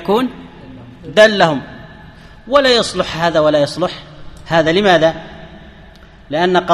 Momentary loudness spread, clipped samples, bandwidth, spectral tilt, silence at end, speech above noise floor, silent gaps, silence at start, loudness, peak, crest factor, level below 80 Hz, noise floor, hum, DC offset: 22 LU; under 0.1%; 13.5 kHz; -4.5 dB/octave; 0 s; 27 dB; none; 0 s; -14 LUFS; 0 dBFS; 16 dB; -42 dBFS; -40 dBFS; none; under 0.1%